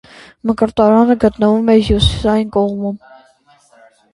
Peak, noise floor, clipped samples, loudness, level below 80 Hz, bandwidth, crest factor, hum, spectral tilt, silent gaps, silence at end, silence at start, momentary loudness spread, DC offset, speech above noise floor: 0 dBFS; -51 dBFS; under 0.1%; -14 LUFS; -30 dBFS; 11.5 kHz; 14 dB; none; -7 dB/octave; none; 1.15 s; 0.45 s; 12 LU; under 0.1%; 38 dB